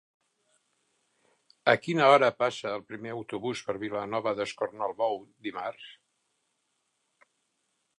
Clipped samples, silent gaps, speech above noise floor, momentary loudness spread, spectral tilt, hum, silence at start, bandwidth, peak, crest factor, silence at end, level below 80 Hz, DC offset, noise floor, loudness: under 0.1%; none; 49 dB; 17 LU; -5 dB/octave; none; 1.65 s; 11 kHz; -6 dBFS; 24 dB; 2.05 s; -76 dBFS; under 0.1%; -77 dBFS; -29 LUFS